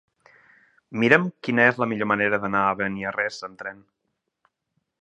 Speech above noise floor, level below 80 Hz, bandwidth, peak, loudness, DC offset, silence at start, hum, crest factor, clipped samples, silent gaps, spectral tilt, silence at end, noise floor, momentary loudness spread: 55 dB; -64 dBFS; 8.8 kHz; 0 dBFS; -22 LUFS; under 0.1%; 0.9 s; none; 24 dB; under 0.1%; none; -6.5 dB/octave; 1.3 s; -78 dBFS; 17 LU